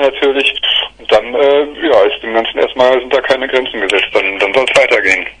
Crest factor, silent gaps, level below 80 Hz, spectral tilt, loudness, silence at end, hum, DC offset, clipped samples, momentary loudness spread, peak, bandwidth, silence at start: 12 dB; none; -46 dBFS; -2.5 dB/octave; -11 LUFS; 0.1 s; none; under 0.1%; 0.1%; 4 LU; 0 dBFS; 10.5 kHz; 0 s